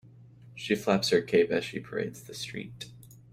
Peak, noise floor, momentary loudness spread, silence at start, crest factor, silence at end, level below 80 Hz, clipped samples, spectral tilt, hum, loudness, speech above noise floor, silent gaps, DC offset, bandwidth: -12 dBFS; -52 dBFS; 19 LU; 0.05 s; 20 dB; 0.2 s; -66 dBFS; under 0.1%; -4.5 dB/octave; none; -29 LUFS; 24 dB; none; under 0.1%; 16 kHz